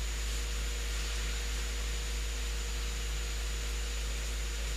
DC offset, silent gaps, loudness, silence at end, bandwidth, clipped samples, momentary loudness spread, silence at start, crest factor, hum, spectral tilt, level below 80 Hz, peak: under 0.1%; none; -36 LUFS; 0 s; 15.5 kHz; under 0.1%; 1 LU; 0 s; 10 dB; none; -2.5 dB/octave; -36 dBFS; -24 dBFS